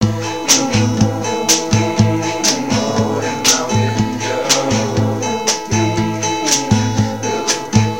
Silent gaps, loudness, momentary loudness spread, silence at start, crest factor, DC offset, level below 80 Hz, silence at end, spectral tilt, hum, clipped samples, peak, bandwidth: none; -15 LUFS; 5 LU; 0 s; 16 dB; 1%; -40 dBFS; 0 s; -4 dB/octave; none; under 0.1%; 0 dBFS; 17 kHz